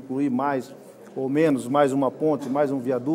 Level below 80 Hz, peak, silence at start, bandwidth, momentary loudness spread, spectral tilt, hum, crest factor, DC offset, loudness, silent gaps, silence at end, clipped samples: -72 dBFS; -6 dBFS; 0 s; 15 kHz; 10 LU; -7 dB/octave; none; 16 dB; under 0.1%; -23 LUFS; none; 0 s; under 0.1%